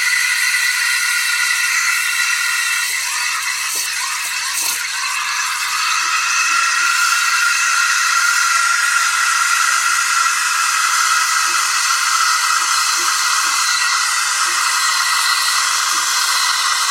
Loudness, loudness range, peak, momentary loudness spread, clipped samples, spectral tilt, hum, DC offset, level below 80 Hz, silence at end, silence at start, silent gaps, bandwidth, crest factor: -14 LUFS; 3 LU; -2 dBFS; 4 LU; under 0.1%; 4.5 dB/octave; none; under 0.1%; -64 dBFS; 0 s; 0 s; none; 16.5 kHz; 14 dB